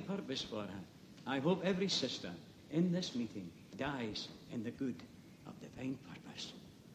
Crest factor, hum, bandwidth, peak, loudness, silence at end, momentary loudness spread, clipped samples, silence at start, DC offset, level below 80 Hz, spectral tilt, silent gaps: 20 dB; none; 15 kHz; -22 dBFS; -40 LUFS; 0 s; 18 LU; under 0.1%; 0 s; under 0.1%; -70 dBFS; -5 dB/octave; none